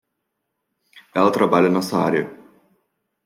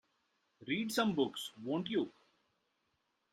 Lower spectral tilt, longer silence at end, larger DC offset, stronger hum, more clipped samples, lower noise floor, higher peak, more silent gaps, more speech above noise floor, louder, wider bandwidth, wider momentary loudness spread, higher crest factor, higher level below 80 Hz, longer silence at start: first, -6.5 dB/octave vs -4.5 dB/octave; second, 0.9 s vs 1.2 s; neither; neither; neither; second, -77 dBFS vs -81 dBFS; first, -2 dBFS vs -18 dBFS; neither; first, 59 dB vs 46 dB; first, -19 LUFS vs -37 LUFS; first, 16.5 kHz vs 13 kHz; about the same, 10 LU vs 10 LU; about the same, 20 dB vs 22 dB; first, -66 dBFS vs -78 dBFS; first, 0.95 s vs 0.6 s